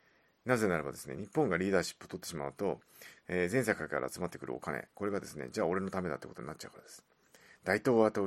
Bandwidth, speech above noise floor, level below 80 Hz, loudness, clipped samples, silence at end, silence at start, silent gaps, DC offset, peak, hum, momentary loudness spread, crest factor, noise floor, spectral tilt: 14.5 kHz; 28 dB; -68 dBFS; -35 LUFS; under 0.1%; 0 s; 0.45 s; none; under 0.1%; -12 dBFS; none; 15 LU; 24 dB; -62 dBFS; -5.5 dB/octave